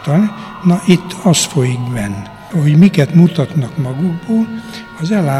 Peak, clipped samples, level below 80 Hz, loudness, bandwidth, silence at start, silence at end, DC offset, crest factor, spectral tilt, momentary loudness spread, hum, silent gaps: 0 dBFS; 0.2%; -46 dBFS; -14 LUFS; 14 kHz; 0 s; 0 s; under 0.1%; 14 dB; -6 dB/octave; 12 LU; none; none